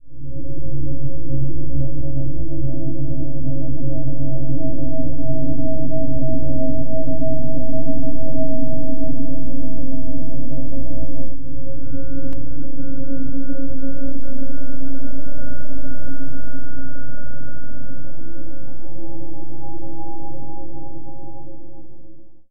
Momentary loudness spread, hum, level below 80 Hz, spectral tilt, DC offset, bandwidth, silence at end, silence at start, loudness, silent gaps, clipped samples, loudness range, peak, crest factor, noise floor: 13 LU; none; -36 dBFS; -13 dB/octave; 40%; 1.6 kHz; 0 s; 0 s; -29 LUFS; none; under 0.1%; 12 LU; -2 dBFS; 10 dB; -38 dBFS